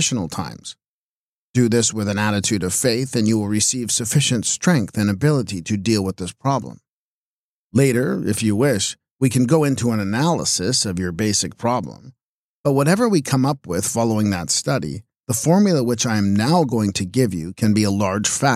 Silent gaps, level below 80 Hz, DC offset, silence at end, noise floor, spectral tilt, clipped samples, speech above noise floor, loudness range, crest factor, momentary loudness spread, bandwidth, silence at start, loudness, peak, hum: 0.88-1.54 s, 6.89-7.70 s, 9.11-9.19 s, 12.24-12.64 s; -54 dBFS; under 0.1%; 0 s; under -90 dBFS; -4.5 dB/octave; under 0.1%; over 71 dB; 3 LU; 16 dB; 7 LU; 15.5 kHz; 0 s; -19 LUFS; -4 dBFS; none